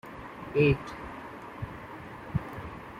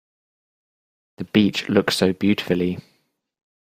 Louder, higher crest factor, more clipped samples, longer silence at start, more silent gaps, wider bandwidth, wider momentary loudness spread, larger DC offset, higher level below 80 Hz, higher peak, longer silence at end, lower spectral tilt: second, -32 LUFS vs -20 LUFS; about the same, 22 dB vs 20 dB; neither; second, 0.05 s vs 1.2 s; neither; about the same, 15 kHz vs 15.5 kHz; first, 18 LU vs 9 LU; neither; first, -50 dBFS vs -58 dBFS; second, -12 dBFS vs -4 dBFS; second, 0 s vs 0.9 s; first, -8 dB/octave vs -5.5 dB/octave